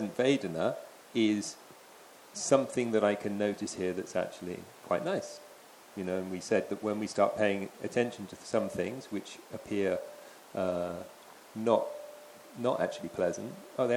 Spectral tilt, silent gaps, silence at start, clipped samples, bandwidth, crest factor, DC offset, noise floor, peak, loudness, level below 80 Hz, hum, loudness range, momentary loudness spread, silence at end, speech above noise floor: -5 dB/octave; none; 0 s; under 0.1%; 18.5 kHz; 22 dB; under 0.1%; -54 dBFS; -10 dBFS; -33 LUFS; -74 dBFS; none; 4 LU; 19 LU; 0 s; 23 dB